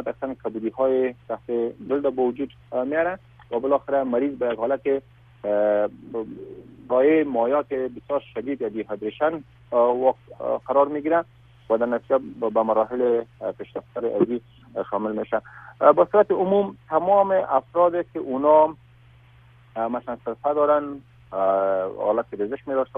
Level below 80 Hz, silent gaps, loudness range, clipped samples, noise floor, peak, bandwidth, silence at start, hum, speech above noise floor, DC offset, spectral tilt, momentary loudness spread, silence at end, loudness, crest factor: -60 dBFS; none; 5 LU; under 0.1%; -52 dBFS; -2 dBFS; 3.7 kHz; 0 s; none; 29 dB; under 0.1%; -9.5 dB/octave; 14 LU; 0 s; -23 LUFS; 20 dB